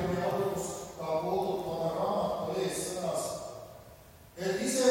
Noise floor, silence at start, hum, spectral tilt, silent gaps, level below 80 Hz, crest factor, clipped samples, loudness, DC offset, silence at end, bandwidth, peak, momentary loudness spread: -54 dBFS; 0 s; none; -4.5 dB/octave; none; -60 dBFS; 18 dB; under 0.1%; -33 LUFS; under 0.1%; 0 s; 16 kHz; -14 dBFS; 15 LU